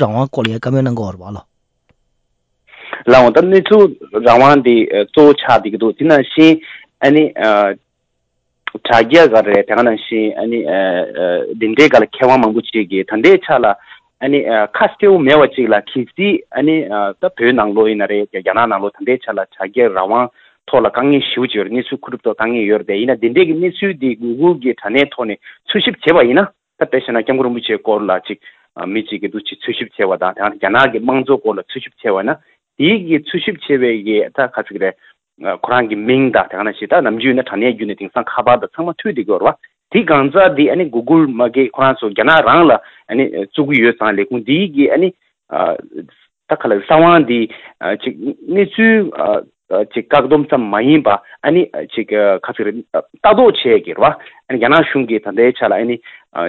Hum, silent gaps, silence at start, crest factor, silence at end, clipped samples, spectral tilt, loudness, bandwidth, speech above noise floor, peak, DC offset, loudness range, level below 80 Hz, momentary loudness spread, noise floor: none; none; 0 s; 14 dB; 0 s; 0.2%; -7 dB/octave; -13 LUFS; 8 kHz; 56 dB; 0 dBFS; under 0.1%; 5 LU; -52 dBFS; 12 LU; -69 dBFS